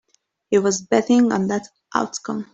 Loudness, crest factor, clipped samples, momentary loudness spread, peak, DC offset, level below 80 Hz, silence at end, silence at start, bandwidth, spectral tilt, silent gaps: -20 LUFS; 18 dB; under 0.1%; 10 LU; -4 dBFS; under 0.1%; -62 dBFS; 0.1 s; 0.5 s; 8.2 kHz; -5 dB/octave; none